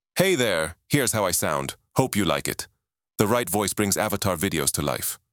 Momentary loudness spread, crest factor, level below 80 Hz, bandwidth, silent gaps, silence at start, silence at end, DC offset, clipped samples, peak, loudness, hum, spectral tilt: 7 LU; 22 dB; -50 dBFS; over 20 kHz; none; 0.15 s; 0.15 s; under 0.1%; under 0.1%; -2 dBFS; -24 LUFS; none; -3.5 dB/octave